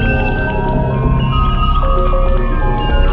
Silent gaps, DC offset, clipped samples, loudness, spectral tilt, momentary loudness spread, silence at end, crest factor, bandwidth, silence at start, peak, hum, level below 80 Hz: none; under 0.1%; under 0.1%; -16 LUFS; -9.5 dB/octave; 2 LU; 0 s; 10 dB; 4 kHz; 0 s; -2 dBFS; none; -14 dBFS